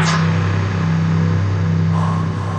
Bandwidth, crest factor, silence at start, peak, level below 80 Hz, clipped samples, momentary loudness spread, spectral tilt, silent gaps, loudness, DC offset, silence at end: 8.6 kHz; 12 dB; 0 s; -4 dBFS; -46 dBFS; under 0.1%; 2 LU; -6.5 dB/octave; none; -17 LUFS; under 0.1%; 0 s